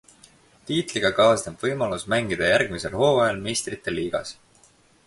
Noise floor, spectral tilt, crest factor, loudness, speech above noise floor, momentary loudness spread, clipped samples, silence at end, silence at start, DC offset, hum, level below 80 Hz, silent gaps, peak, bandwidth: -57 dBFS; -4 dB/octave; 20 dB; -23 LUFS; 35 dB; 9 LU; under 0.1%; 0.75 s; 0.65 s; under 0.1%; none; -52 dBFS; none; -4 dBFS; 11.5 kHz